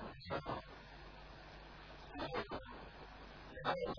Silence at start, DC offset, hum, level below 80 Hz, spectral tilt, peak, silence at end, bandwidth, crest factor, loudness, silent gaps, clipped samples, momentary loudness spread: 0 s; under 0.1%; none; -60 dBFS; -3.5 dB/octave; -24 dBFS; 0 s; 5.4 kHz; 22 dB; -48 LUFS; none; under 0.1%; 13 LU